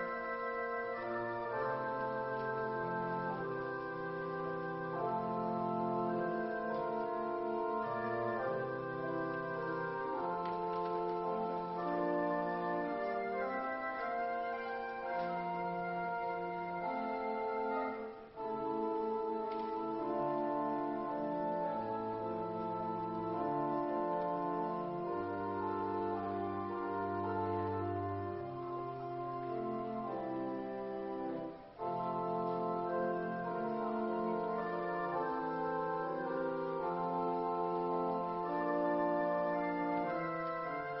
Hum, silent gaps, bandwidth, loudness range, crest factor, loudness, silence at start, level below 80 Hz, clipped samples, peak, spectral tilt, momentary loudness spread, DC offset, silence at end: none; none; 5.6 kHz; 3 LU; 14 dB; -38 LUFS; 0 s; -70 dBFS; under 0.1%; -24 dBFS; -5.5 dB/octave; 4 LU; under 0.1%; 0 s